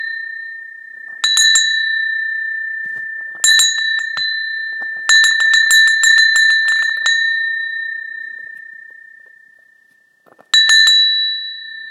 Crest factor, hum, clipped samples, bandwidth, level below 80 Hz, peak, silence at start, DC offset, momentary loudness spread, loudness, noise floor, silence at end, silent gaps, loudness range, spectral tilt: 16 dB; none; under 0.1%; 16 kHz; -82 dBFS; 0 dBFS; 0 s; under 0.1%; 19 LU; -12 LUFS; -54 dBFS; 0 s; none; 9 LU; 5.5 dB/octave